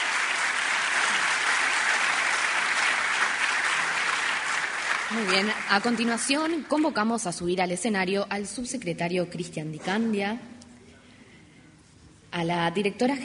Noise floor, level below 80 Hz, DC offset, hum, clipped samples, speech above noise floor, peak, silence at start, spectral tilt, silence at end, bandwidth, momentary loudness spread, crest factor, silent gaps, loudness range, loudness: -53 dBFS; -64 dBFS; under 0.1%; none; under 0.1%; 27 dB; -6 dBFS; 0 s; -3 dB/octave; 0 s; 10.5 kHz; 8 LU; 20 dB; none; 8 LU; -25 LUFS